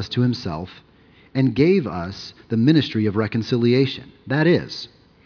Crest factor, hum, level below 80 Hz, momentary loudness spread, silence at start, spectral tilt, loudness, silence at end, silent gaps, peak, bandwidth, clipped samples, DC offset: 16 dB; none; -52 dBFS; 15 LU; 0 s; -7.5 dB/octave; -20 LUFS; 0.4 s; none; -4 dBFS; 5.4 kHz; under 0.1%; under 0.1%